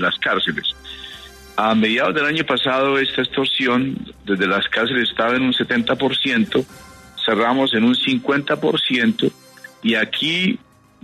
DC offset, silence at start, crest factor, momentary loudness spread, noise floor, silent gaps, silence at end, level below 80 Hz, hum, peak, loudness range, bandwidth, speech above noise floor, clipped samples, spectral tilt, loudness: under 0.1%; 0 s; 16 dB; 9 LU; -39 dBFS; none; 0.45 s; -54 dBFS; none; -4 dBFS; 1 LU; 13.5 kHz; 20 dB; under 0.1%; -5 dB/octave; -18 LUFS